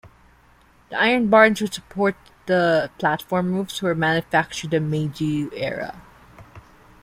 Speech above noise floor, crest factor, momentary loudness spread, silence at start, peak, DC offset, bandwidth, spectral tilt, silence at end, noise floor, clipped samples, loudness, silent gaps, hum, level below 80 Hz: 34 dB; 20 dB; 12 LU; 0.05 s; -2 dBFS; under 0.1%; 16 kHz; -5.5 dB/octave; 0.4 s; -54 dBFS; under 0.1%; -21 LUFS; none; none; -54 dBFS